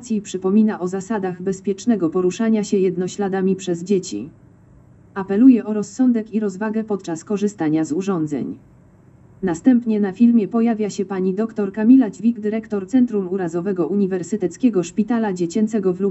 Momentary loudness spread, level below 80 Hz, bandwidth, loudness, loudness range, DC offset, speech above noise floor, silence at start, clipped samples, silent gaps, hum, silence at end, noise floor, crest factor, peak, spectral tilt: 10 LU; -60 dBFS; 8.2 kHz; -19 LUFS; 4 LU; under 0.1%; 30 dB; 0 s; under 0.1%; none; none; 0 s; -49 dBFS; 18 dB; -2 dBFS; -7 dB/octave